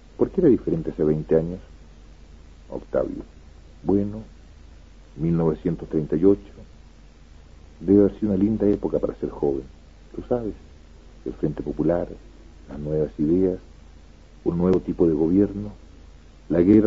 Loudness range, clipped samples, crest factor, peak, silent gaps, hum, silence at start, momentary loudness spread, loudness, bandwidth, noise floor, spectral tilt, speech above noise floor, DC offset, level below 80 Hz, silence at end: 6 LU; under 0.1%; 18 dB; -4 dBFS; none; none; 0.2 s; 18 LU; -23 LUFS; 7.2 kHz; -48 dBFS; -10.5 dB/octave; 26 dB; 0.2%; -42 dBFS; 0 s